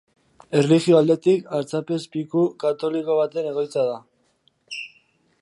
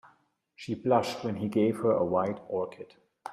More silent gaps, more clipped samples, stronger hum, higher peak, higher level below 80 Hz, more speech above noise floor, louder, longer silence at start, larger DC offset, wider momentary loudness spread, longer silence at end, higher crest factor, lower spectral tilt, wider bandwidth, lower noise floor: neither; neither; neither; first, -4 dBFS vs -12 dBFS; about the same, -70 dBFS vs -70 dBFS; first, 44 dB vs 38 dB; first, -21 LUFS vs -29 LUFS; about the same, 0.5 s vs 0.6 s; neither; about the same, 17 LU vs 19 LU; first, 0.55 s vs 0 s; about the same, 18 dB vs 18 dB; about the same, -6.5 dB/octave vs -7 dB/octave; second, 11.5 kHz vs 14 kHz; about the same, -65 dBFS vs -67 dBFS